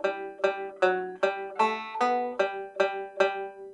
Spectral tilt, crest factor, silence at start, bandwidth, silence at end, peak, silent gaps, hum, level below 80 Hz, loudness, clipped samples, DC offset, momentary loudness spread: -4 dB/octave; 20 dB; 0 s; 10.5 kHz; 0 s; -10 dBFS; none; none; -76 dBFS; -28 LUFS; under 0.1%; under 0.1%; 3 LU